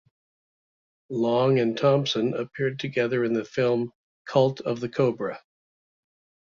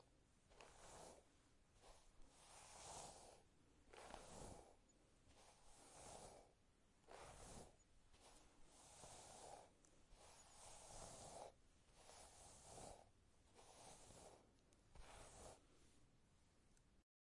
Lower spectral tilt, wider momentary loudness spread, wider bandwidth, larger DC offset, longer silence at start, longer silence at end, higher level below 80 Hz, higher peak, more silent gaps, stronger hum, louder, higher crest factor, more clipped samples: first, -6.5 dB/octave vs -3 dB/octave; about the same, 10 LU vs 9 LU; second, 7.4 kHz vs 12 kHz; neither; first, 1.1 s vs 0 s; first, 1.1 s vs 0.35 s; first, -68 dBFS vs -74 dBFS; first, -8 dBFS vs -40 dBFS; first, 3.95-4.25 s vs none; neither; first, -25 LUFS vs -63 LUFS; second, 18 dB vs 24 dB; neither